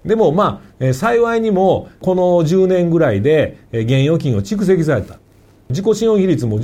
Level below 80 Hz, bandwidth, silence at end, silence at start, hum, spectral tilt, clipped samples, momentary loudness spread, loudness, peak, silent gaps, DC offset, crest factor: -44 dBFS; 15.5 kHz; 0 s; 0.05 s; none; -7.5 dB/octave; under 0.1%; 7 LU; -15 LUFS; -2 dBFS; none; under 0.1%; 12 dB